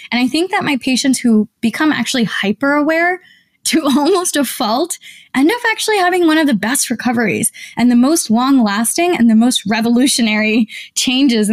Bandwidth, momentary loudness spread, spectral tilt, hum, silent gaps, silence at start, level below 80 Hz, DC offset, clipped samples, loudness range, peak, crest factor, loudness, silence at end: 16 kHz; 5 LU; -3 dB/octave; none; none; 0 s; -58 dBFS; under 0.1%; under 0.1%; 2 LU; -4 dBFS; 10 dB; -14 LUFS; 0 s